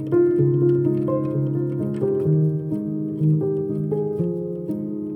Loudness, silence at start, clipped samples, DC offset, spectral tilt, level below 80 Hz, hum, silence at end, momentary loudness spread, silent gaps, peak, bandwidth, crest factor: -22 LUFS; 0 s; under 0.1%; under 0.1%; -12.5 dB/octave; -60 dBFS; none; 0 s; 8 LU; none; -8 dBFS; 3.2 kHz; 12 dB